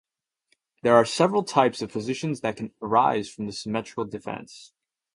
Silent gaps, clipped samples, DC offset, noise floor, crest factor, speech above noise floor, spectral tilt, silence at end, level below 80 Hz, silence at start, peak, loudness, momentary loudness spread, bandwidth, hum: none; under 0.1%; under 0.1%; -71 dBFS; 22 dB; 47 dB; -5 dB/octave; 0.5 s; -64 dBFS; 0.85 s; -4 dBFS; -25 LUFS; 15 LU; 11.5 kHz; none